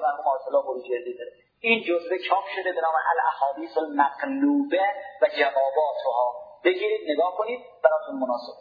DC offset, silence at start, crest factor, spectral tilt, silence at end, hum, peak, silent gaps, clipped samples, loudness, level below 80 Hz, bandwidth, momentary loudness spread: under 0.1%; 0 s; 20 dB; -6 dB/octave; 0 s; none; -4 dBFS; none; under 0.1%; -25 LUFS; -78 dBFS; 5 kHz; 7 LU